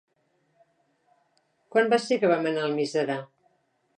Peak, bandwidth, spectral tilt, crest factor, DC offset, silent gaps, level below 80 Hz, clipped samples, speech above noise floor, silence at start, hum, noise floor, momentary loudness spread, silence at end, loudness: -8 dBFS; 10 kHz; -5 dB/octave; 20 dB; under 0.1%; none; -84 dBFS; under 0.1%; 46 dB; 1.75 s; none; -71 dBFS; 6 LU; 0.75 s; -25 LUFS